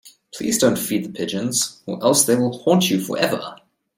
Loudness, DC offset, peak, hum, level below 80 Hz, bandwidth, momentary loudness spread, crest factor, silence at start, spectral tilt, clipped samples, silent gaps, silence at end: -19 LUFS; under 0.1%; -2 dBFS; none; -62 dBFS; 17 kHz; 11 LU; 18 dB; 0.05 s; -3.5 dB/octave; under 0.1%; none; 0.4 s